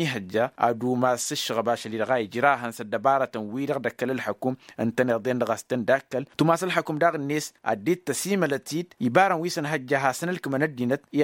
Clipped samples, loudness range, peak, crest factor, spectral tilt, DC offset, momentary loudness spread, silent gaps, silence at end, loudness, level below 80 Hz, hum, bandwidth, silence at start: under 0.1%; 2 LU; -4 dBFS; 20 dB; -5 dB/octave; under 0.1%; 6 LU; none; 0 s; -25 LUFS; -70 dBFS; none; 16.5 kHz; 0 s